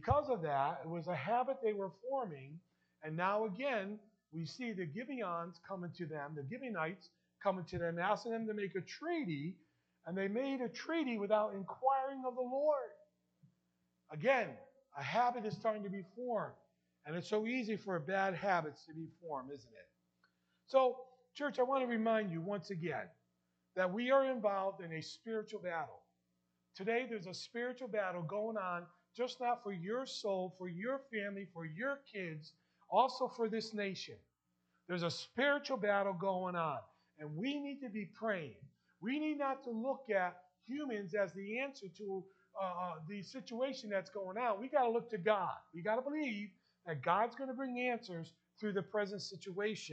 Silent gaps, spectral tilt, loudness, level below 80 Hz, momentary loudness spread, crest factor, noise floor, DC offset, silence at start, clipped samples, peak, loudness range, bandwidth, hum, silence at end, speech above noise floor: none; -6 dB/octave; -39 LUFS; -74 dBFS; 13 LU; 22 dB; -83 dBFS; under 0.1%; 0 s; under 0.1%; -18 dBFS; 4 LU; 8.4 kHz; 60 Hz at -70 dBFS; 0 s; 44 dB